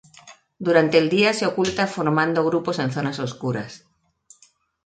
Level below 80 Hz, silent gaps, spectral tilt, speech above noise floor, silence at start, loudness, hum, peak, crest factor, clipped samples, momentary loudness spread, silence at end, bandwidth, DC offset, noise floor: -60 dBFS; none; -5.5 dB/octave; 38 dB; 0.25 s; -21 LUFS; none; -4 dBFS; 20 dB; under 0.1%; 11 LU; 1.1 s; 9.2 kHz; under 0.1%; -59 dBFS